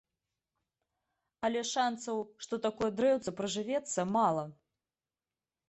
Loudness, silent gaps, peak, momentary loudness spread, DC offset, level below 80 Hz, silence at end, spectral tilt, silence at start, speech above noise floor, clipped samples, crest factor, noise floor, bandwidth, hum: -33 LUFS; none; -16 dBFS; 8 LU; under 0.1%; -72 dBFS; 1.15 s; -4 dB/octave; 1.4 s; over 58 dB; under 0.1%; 18 dB; under -90 dBFS; 8.6 kHz; none